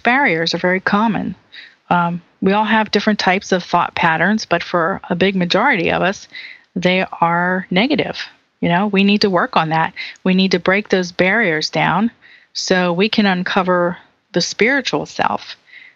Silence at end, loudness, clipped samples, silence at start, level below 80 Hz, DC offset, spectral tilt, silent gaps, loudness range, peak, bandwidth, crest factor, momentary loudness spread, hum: 0.15 s; -16 LUFS; under 0.1%; 0.05 s; -54 dBFS; under 0.1%; -5 dB/octave; none; 1 LU; 0 dBFS; 7.6 kHz; 16 dB; 9 LU; none